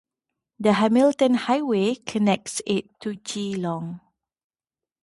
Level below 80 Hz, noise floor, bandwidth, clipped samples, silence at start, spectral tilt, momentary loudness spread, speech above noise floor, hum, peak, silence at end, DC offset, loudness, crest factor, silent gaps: -66 dBFS; under -90 dBFS; 11.5 kHz; under 0.1%; 0.6 s; -5 dB/octave; 14 LU; over 68 dB; none; -6 dBFS; 1.05 s; under 0.1%; -23 LUFS; 18 dB; none